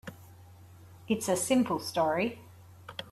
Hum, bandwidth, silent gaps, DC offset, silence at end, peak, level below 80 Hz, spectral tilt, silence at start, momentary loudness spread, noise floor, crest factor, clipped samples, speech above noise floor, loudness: none; 14 kHz; none; under 0.1%; 0 s; -14 dBFS; -68 dBFS; -4 dB/octave; 0.05 s; 21 LU; -53 dBFS; 18 dB; under 0.1%; 24 dB; -29 LUFS